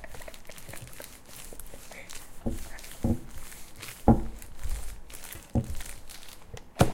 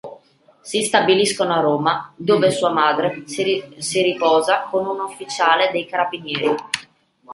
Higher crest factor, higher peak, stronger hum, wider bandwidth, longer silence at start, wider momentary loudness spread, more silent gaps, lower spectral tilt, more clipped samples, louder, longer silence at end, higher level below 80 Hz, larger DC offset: first, 26 dB vs 18 dB; second, -6 dBFS vs -2 dBFS; neither; first, 17 kHz vs 11.5 kHz; about the same, 0 s vs 0.05 s; first, 18 LU vs 9 LU; neither; first, -6 dB/octave vs -3.5 dB/octave; neither; second, -34 LUFS vs -19 LUFS; about the same, 0 s vs 0 s; first, -38 dBFS vs -66 dBFS; neither